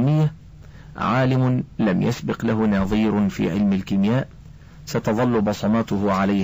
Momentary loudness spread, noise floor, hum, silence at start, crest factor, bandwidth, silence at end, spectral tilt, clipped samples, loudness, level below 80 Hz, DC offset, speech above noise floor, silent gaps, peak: 6 LU; -42 dBFS; none; 0 s; 12 dB; 16 kHz; 0 s; -7.5 dB/octave; under 0.1%; -21 LUFS; -44 dBFS; 0.2%; 22 dB; none; -10 dBFS